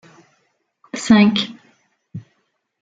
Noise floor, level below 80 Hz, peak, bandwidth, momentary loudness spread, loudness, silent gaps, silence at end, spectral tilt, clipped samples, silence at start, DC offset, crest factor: -68 dBFS; -56 dBFS; -2 dBFS; 9.2 kHz; 25 LU; -16 LUFS; none; 0.65 s; -5 dB/octave; under 0.1%; 0.95 s; under 0.1%; 18 dB